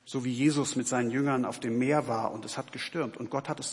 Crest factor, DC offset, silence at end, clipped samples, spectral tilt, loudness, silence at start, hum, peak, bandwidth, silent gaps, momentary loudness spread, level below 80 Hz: 16 dB; under 0.1%; 0 s; under 0.1%; -5 dB/octave; -30 LUFS; 0.05 s; none; -14 dBFS; 11.5 kHz; none; 8 LU; -76 dBFS